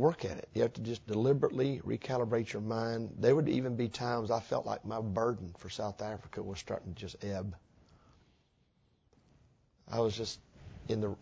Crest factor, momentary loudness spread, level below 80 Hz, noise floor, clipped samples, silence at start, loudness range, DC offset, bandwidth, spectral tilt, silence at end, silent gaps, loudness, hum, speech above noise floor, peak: 20 dB; 13 LU; -60 dBFS; -72 dBFS; under 0.1%; 0 s; 12 LU; under 0.1%; 8 kHz; -6.5 dB/octave; 0.05 s; none; -35 LUFS; none; 38 dB; -14 dBFS